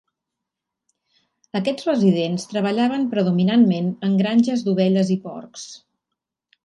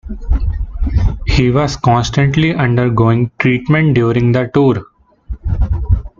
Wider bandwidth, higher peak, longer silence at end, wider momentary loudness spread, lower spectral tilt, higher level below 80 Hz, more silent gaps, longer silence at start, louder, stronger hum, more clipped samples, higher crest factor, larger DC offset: first, 11 kHz vs 7.4 kHz; second, -6 dBFS vs 0 dBFS; first, 0.85 s vs 0.1 s; first, 15 LU vs 9 LU; about the same, -7 dB/octave vs -7 dB/octave; second, -68 dBFS vs -20 dBFS; neither; first, 1.55 s vs 0.05 s; second, -20 LUFS vs -14 LUFS; neither; neither; about the same, 16 dB vs 12 dB; neither